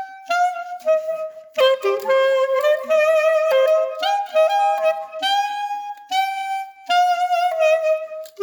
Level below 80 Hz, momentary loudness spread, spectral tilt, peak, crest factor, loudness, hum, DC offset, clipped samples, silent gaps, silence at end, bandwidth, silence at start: -80 dBFS; 10 LU; 0 dB/octave; -6 dBFS; 14 dB; -19 LUFS; none; under 0.1%; under 0.1%; none; 0 s; 19 kHz; 0 s